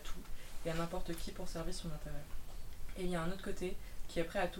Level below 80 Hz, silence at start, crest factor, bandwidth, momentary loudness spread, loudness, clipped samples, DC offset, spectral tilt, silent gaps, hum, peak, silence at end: -46 dBFS; 0 s; 16 dB; 16.5 kHz; 13 LU; -44 LUFS; under 0.1%; under 0.1%; -5 dB/octave; none; none; -22 dBFS; 0 s